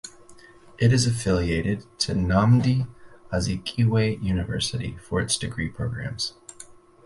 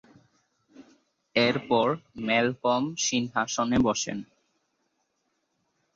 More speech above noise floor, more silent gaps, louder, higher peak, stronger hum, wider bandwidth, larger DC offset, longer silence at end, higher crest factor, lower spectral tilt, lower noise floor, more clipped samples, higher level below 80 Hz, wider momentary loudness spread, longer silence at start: second, 25 dB vs 50 dB; neither; about the same, -24 LUFS vs -26 LUFS; about the same, -8 dBFS vs -10 dBFS; neither; first, 11.5 kHz vs 7.8 kHz; neither; second, 0.35 s vs 1.7 s; about the same, 16 dB vs 20 dB; first, -5.5 dB/octave vs -3.5 dB/octave; second, -49 dBFS vs -76 dBFS; neither; first, -40 dBFS vs -56 dBFS; first, 11 LU vs 6 LU; second, 0.05 s vs 0.8 s